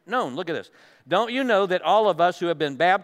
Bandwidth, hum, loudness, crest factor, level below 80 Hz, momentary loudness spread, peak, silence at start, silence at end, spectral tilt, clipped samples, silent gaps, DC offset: 14 kHz; none; -23 LUFS; 16 dB; -82 dBFS; 10 LU; -8 dBFS; 0.1 s; 0 s; -5 dB/octave; under 0.1%; none; under 0.1%